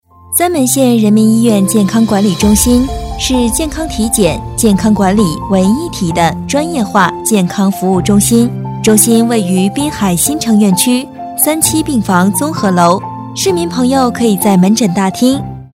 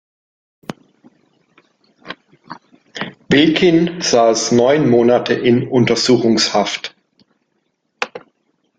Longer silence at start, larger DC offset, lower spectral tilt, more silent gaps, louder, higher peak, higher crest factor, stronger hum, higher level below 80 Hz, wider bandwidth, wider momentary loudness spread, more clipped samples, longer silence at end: second, 0.3 s vs 0.7 s; neither; about the same, -4.5 dB/octave vs -4.5 dB/octave; neither; first, -11 LUFS vs -14 LUFS; about the same, 0 dBFS vs -2 dBFS; second, 10 dB vs 16 dB; neither; first, -30 dBFS vs -54 dBFS; first, 18.5 kHz vs 9.4 kHz; second, 6 LU vs 22 LU; first, 0.4% vs under 0.1%; second, 0.1 s vs 0.6 s